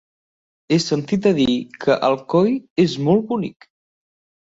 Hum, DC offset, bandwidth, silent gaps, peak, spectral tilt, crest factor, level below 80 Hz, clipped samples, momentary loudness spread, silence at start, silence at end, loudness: none; under 0.1%; 8 kHz; 2.70-2.76 s; -4 dBFS; -6 dB/octave; 16 dB; -56 dBFS; under 0.1%; 5 LU; 0.7 s; 0.95 s; -19 LUFS